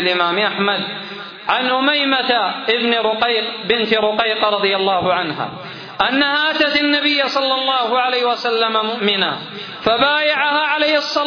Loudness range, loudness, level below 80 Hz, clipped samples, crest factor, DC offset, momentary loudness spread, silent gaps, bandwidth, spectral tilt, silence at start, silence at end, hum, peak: 1 LU; -16 LUFS; -58 dBFS; under 0.1%; 16 dB; under 0.1%; 8 LU; none; 5.4 kHz; -4.5 dB/octave; 0 s; 0 s; none; -2 dBFS